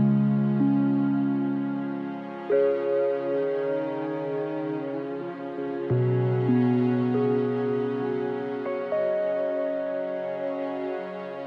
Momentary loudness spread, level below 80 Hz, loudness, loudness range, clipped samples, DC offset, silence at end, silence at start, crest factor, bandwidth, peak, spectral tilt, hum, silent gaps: 9 LU; -70 dBFS; -27 LUFS; 3 LU; under 0.1%; under 0.1%; 0 s; 0 s; 14 dB; 5.4 kHz; -12 dBFS; -10.5 dB/octave; none; none